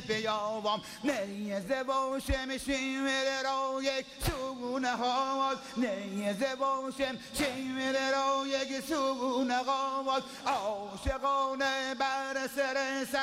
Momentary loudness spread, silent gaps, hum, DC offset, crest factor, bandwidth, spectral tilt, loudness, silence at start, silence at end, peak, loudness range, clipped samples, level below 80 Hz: 5 LU; none; none; under 0.1%; 16 dB; 16 kHz; -3.5 dB/octave; -32 LUFS; 0 s; 0 s; -16 dBFS; 1 LU; under 0.1%; -50 dBFS